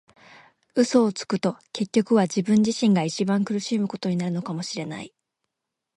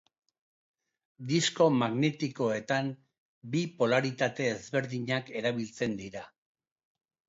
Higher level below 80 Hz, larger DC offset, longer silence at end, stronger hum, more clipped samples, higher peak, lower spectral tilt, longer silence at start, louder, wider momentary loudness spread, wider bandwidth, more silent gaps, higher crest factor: about the same, -68 dBFS vs -72 dBFS; neither; about the same, 0.9 s vs 1 s; neither; neither; first, -6 dBFS vs -12 dBFS; about the same, -5.5 dB/octave vs -5 dB/octave; second, 0.75 s vs 1.2 s; first, -24 LUFS vs -30 LUFS; second, 10 LU vs 13 LU; first, 11.5 kHz vs 8 kHz; second, none vs 3.18-3.41 s; about the same, 18 dB vs 20 dB